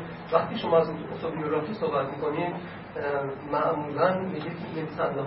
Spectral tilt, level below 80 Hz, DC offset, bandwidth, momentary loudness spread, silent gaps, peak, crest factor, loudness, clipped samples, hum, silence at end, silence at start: -10.5 dB/octave; -60 dBFS; under 0.1%; 5.8 kHz; 10 LU; none; -6 dBFS; 22 dB; -28 LUFS; under 0.1%; none; 0 s; 0 s